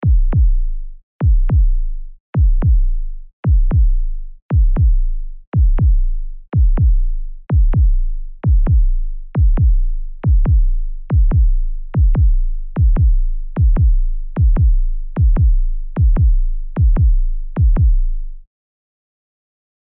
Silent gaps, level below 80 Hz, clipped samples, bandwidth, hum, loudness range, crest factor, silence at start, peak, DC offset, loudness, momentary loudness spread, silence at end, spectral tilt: 1.03-1.19 s, 2.20-2.33 s, 3.33-3.43 s, 4.42-4.49 s, 5.47-5.52 s; -14 dBFS; under 0.1%; 2.4 kHz; none; 2 LU; 6 dB; 0 s; -6 dBFS; under 0.1%; -18 LUFS; 12 LU; 1.55 s; -11.5 dB/octave